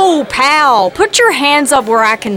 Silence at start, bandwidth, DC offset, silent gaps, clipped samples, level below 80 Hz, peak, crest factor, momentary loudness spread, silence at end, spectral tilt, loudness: 0 s; 17 kHz; under 0.1%; none; under 0.1%; -46 dBFS; 0 dBFS; 10 dB; 3 LU; 0 s; -2 dB/octave; -9 LUFS